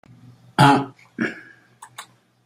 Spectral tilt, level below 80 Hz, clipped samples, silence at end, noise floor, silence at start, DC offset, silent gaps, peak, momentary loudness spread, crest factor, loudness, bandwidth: -5.5 dB/octave; -58 dBFS; under 0.1%; 0.45 s; -48 dBFS; 0.6 s; under 0.1%; none; 0 dBFS; 26 LU; 22 dB; -19 LUFS; 16 kHz